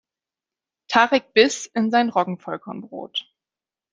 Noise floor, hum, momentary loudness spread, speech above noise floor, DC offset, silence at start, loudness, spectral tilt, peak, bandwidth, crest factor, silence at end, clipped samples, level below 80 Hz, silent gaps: under -90 dBFS; none; 14 LU; over 69 dB; under 0.1%; 0.9 s; -20 LUFS; -3.5 dB/octave; -2 dBFS; 10 kHz; 22 dB; 0.7 s; under 0.1%; -68 dBFS; none